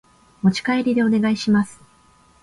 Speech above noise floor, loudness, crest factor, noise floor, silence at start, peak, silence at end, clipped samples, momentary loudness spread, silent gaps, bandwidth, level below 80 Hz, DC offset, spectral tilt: 36 dB; -20 LUFS; 14 dB; -54 dBFS; 0.45 s; -6 dBFS; 0.7 s; under 0.1%; 3 LU; none; 11.5 kHz; -56 dBFS; under 0.1%; -6 dB/octave